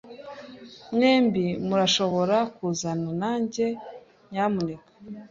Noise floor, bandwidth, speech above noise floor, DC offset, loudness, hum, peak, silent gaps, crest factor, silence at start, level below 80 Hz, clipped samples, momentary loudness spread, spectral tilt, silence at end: -44 dBFS; 7.8 kHz; 20 dB; under 0.1%; -25 LUFS; none; -8 dBFS; none; 16 dB; 0.05 s; -62 dBFS; under 0.1%; 21 LU; -5 dB/octave; 0.05 s